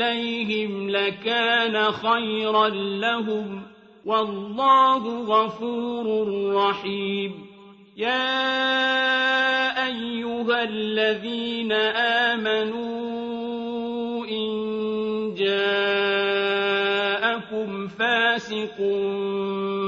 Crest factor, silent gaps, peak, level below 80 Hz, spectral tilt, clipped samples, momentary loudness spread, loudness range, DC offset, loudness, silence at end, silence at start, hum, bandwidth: 18 dB; none; -6 dBFS; -68 dBFS; -5 dB/octave; under 0.1%; 9 LU; 3 LU; under 0.1%; -23 LUFS; 0 s; 0 s; none; 7.8 kHz